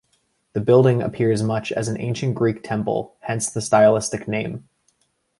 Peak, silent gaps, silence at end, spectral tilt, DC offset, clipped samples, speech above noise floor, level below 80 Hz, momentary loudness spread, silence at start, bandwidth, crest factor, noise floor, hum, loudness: -2 dBFS; none; 0.8 s; -6 dB/octave; under 0.1%; under 0.1%; 48 dB; -54 dBFS; 11 LU; 0.55 s; 11.5 kHz; 18 dB; -68 dBFS; none; -21 LUFS